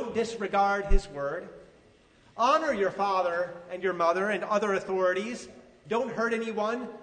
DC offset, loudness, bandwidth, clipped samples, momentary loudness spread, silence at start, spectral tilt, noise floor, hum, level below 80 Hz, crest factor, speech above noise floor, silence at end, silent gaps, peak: under 0.1%; -28 LUFS; 9.4 kHz; under 0.1%; 10 LU; 0 s; -5 dB/octave; -59 dBFS; none; -36 dBFS; 20 dB; 32 dB; 0 s; none; -8 dBFS